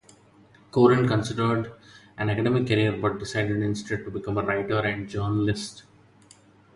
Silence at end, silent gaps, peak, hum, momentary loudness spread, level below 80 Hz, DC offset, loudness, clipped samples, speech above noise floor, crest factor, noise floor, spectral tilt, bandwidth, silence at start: 0.95 s; none; -6 dBFS; none; 11 LU; -52 dBFS; under 0.1%; -25 LUFS; under 0.1%; 31 dB; 20 dB; -55 dBFS; -6.5 dB/octave; 11.5 kHz; 0.75 s